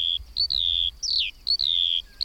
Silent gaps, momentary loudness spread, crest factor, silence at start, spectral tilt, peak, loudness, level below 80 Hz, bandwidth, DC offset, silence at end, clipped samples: none; 4 LU; 14 dB; 0 s; 1.5 dB/octave; -12 dBFS; -22 LUFS; -46 dBFS; 16.5 kHz; under 0.1%; 0 s; under 0.1%